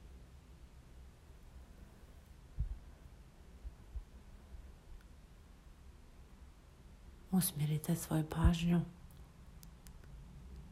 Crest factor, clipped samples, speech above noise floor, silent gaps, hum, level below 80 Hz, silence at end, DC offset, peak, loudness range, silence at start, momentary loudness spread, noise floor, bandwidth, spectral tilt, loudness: 26 dB; under 0.1%; 24 dB; none; none; -48 dBFS; 0 s; under 0.1%; -16 dBFS; 20 LU; 0 s; 26 LU; -58 dBFS; 16 kHz; -6 dB/octave; -37 LUFS